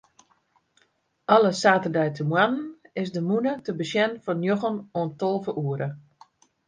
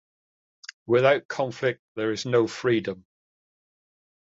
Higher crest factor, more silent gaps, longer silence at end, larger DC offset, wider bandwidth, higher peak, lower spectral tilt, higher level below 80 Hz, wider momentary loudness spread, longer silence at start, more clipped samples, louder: about the same, 22 dB vs 22 dB; second, none vs 1.25-1.29 s, 1.79-1.95 s; second, 0.7 s vs 1.3 s; neither; first, 9.8 kHz vs 7.8 kHz; about the same, -4 dBFS vs -6 dBFS; about the same, -6 dB/octave vs -5.5 dB/octave; about the same, -70 dBFS vs -66 dBFS; second, 12 LU vs 21 LU; first, 1.3 s vs 0.9 s; neither; about the same, -25 LUFS vs -25 LUFS